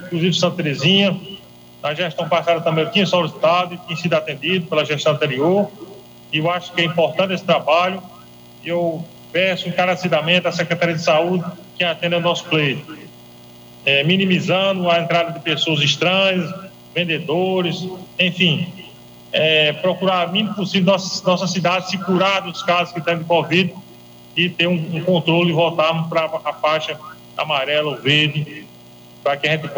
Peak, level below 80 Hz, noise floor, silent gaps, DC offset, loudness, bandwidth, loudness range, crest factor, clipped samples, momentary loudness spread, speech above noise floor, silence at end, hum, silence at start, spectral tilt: -2 dBFS; -64 dBFS; -42 dBFS; none; under 0.1%; -18 LUFS; 19.5 kHz; 2 LU; 16 dB; under 0.1%; 11 LU; 24 dB; 0 s; 60 Hz at -50 dBFS; 0 s; -5 dB/octave